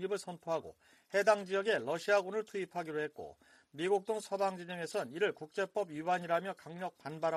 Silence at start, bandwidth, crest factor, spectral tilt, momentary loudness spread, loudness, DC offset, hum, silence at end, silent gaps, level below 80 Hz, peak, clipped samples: 0 s; 14 kHz; 22 dB; -4.5 dB/octave; 11 LU; -36 LUFS; under 0.1%; none; 0 s; none; -80 dBFS; -14 dBFS; under 0.1%